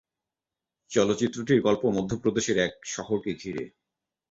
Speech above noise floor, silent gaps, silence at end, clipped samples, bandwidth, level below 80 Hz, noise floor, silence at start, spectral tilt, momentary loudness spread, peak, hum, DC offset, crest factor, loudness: 63 dB; none; 0.6 s; under 0.1%; 8 kHz; -58 dBFS; -89 dBFS; 0.9 s; -5 dB/octave; 12 LU; -8 dBFS; none; under 0.1%; 20 dB; -27 LUFS